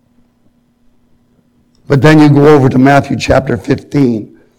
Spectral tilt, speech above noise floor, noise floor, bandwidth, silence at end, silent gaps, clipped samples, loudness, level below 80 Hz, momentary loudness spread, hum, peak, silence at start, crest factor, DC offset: -7.5 dB/octave; 45 dB; -52 dBFS; 12.5 kHz; 0.35 s; none; 0.7%; -9 LUFS; -36 dBFS; 9 LU; none; 0 dBFS; 1.9 s; 10 dB; under 0.1%